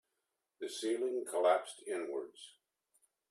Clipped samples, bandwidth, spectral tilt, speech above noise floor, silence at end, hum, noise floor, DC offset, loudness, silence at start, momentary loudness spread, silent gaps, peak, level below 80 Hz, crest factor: under 0.1%; 13.5 kHz; -2 dB/octave; 51 dB; 0.8 s; none; -87 dBFS; under 0.1%; -36 LUFS; 0.6 s; 19 LU; none; -18 dBFS; under -90 dBFS; 20 dB